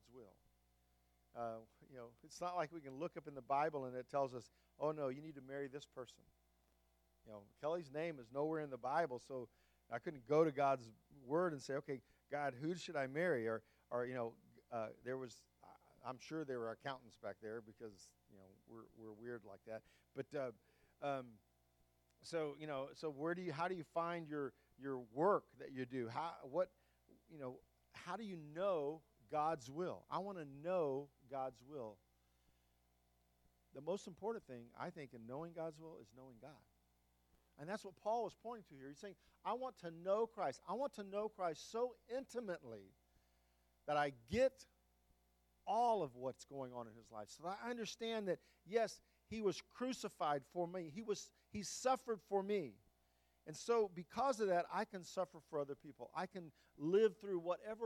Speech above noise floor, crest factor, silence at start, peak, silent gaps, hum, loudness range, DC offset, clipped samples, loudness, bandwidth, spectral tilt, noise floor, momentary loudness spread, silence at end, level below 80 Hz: 35 dB; 22 dB; 0.1 s; -22 dBFS; none; 60 Hz at -80 dBFS; 9 LU; under 0.1%; under 0.1%; -44 LUFS; 17.5 kHz; -5.5 dB/octave; -79 dBFS; 17 LU; 0 s; -78 dBFS